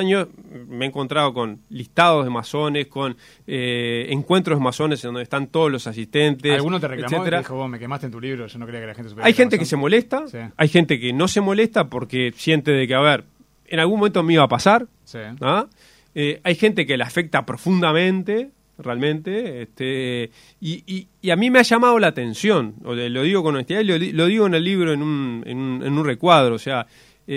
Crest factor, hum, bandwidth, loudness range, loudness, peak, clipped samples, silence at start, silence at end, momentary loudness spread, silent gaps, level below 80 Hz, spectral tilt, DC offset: 20 dB; none; 15.5 kHz; 4 LU; -19 LUFS; 0 dBFS; under 0.1%; 0 s; 0 s; 14 LU; none; -60 dBFS; -5.5 dB/octave; under 0.1%